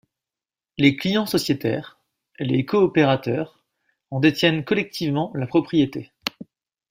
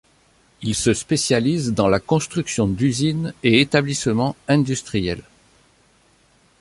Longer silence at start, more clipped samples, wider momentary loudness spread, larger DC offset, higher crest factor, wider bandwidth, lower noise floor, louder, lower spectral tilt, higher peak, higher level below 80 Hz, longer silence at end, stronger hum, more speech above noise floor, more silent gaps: first, 0.8 s vs 0.6 s; neither; first, 13 LU vs 7 LU; neither; about the same, 20 dB vs 20 dB; first, 16 kHz vs 11.5 kHz; first, under -90 dBFS vs -57 dBFS; about the same, -22 LUFS vs -20 LUFS; about the same, -6 dB/octave vs -5 dB/octave; about the same, -4 dBFS vs -2 dBFS; second, -58 dBFS vs -46 dBFS; second, 0.45 s vs 1.4 s; neither; first, over 69 dB vs 38 dB; neither